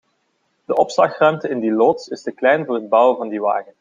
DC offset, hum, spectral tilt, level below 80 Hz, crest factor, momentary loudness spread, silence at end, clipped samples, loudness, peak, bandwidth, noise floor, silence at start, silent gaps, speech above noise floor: under 0.1%; none; -5.5 dB/octave; -68 dBFS; 16 dB; 7 LU; 0.2 s; under 0.1%; -18 LUFS; -2 dBFS; 7.6 kHz; -67 dBFS; 0.7 s; none; 50 dB